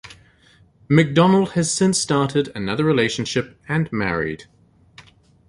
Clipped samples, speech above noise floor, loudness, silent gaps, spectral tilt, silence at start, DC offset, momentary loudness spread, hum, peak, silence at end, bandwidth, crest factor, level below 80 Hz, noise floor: under 0.1%; 35 dB; -19 LUFS; none; -5 dB/octave; 0.05 s; under 0.1%; 10 LU; none; -2 dBFS; 0.5 s; 11.5 kHz; 20 dB; -50 dBFS; -54 dBFS